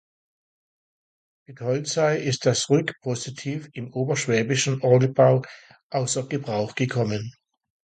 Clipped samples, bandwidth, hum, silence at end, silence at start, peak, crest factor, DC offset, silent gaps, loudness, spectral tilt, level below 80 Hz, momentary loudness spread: under 0.1%; 9.4 kHz; none; 0.55 s; 1.5 s; -4 dBFS; 20 dB; under 0.1%; 5.83-5.90 s; -24 LUFS; -5 dB/octave; -62 dBFS; 13 LU